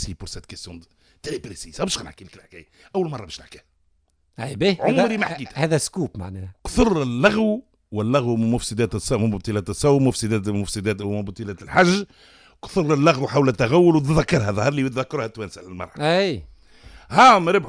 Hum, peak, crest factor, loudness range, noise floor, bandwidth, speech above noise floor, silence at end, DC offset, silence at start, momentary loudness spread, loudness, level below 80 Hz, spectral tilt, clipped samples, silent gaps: none; -4 dBFS; 18 dB; 11 LU; -64 dBFS; 10.5 kHz; 44 dB; 0 s; under 0.1%; 0 s; 18 LU; -20 LUFS; -42 dBFS; -5.5 dB/octave; under 0.1%; none